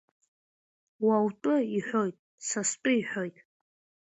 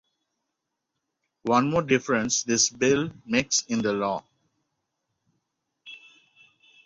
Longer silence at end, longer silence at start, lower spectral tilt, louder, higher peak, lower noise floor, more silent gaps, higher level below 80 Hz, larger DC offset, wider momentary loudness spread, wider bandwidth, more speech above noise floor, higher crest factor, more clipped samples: second, 0.75 s vs 0.9 s; second, 1 s vs 1.45 s; about the same, -4 dB/octave vs -3 dB/octave; second, -29 LUFS vs -24 LUFS; second, -14 dBFS vs -6 dBFS; first, under -90 dBFS vs -82 dBFS; first, 2.19-2.38 s vs none; second, -76 dBFS vs -62 dBFS; neither; second, 9 LU vs 14 LU; about the same, 8.2 kHz vs 8.4 kHz; first, over 62 dB vs 58 dB; second, 16 dB vs 22 dB; neither